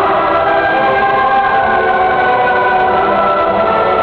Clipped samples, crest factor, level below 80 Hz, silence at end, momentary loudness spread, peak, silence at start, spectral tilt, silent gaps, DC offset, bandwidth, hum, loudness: under 0.1%; 10 dB; -40 dBFS; 0 s; 1 LU; -2 dBFS; 0 s; -7 dB/octave; none; under 0.1%; 5.6 kHz; none; -11 LUFS